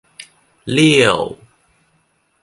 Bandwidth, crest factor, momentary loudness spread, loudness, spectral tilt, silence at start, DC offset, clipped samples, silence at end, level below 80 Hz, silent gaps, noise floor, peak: 11.5 kHz; 18 dB; 17 LU; -14 LUFS; -4.5 dB/octave; 0.2 s; under 0.1%; under 0.1%; 1.1 s; -52 dBFS; none; -62 dBFS; 0 dBFS